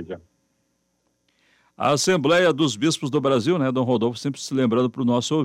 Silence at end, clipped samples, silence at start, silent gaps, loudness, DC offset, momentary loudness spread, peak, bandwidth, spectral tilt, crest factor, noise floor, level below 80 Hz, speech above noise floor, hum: 0 s; under 0.1%; 0 s; none; -21 LUFS; under 0.1%; 8 LU; -6 dBFS; 15.5 kHz; -5 dB/octave; 16 dB; -70 dBFS; -64 dBFS; 50 dB; none